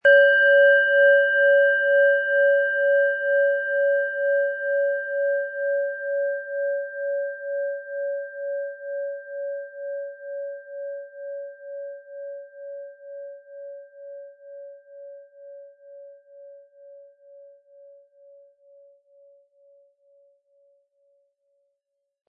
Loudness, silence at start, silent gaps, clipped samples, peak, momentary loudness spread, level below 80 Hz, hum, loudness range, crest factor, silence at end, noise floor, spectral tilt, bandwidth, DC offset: -21 LUFS; 0.05 s; none; under 0.1%; -6 dBFS; 25 LU; -82 dBFS; none; 24 LU; 18 dB; 4.85 s; -80 dBFS; -1.5 dB/octave; 3.1 kHz; under 0.1%